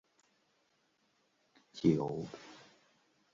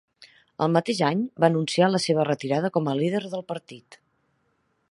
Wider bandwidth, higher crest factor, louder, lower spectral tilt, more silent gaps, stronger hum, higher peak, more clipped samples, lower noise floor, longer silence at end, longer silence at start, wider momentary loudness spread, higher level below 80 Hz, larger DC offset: second, 7.4 kHz vs 11.5 kHz; about the same, 24 dB vs 22 dB; second, -34 LUFS vs -24 LUFS; first, -7.5 dB/octave vs -6 dB/octave; neither; neither; second, -16 dBFS vs -4 dBFS; neither; first, -76 dBFS vs -71 dBFS; second, 0.75 s vs 1 s; first, 1.75 s vs 0.2 s; first, 22 LU vs 10 LU; about the same, -70 dBFS vs -70 dBFS; neither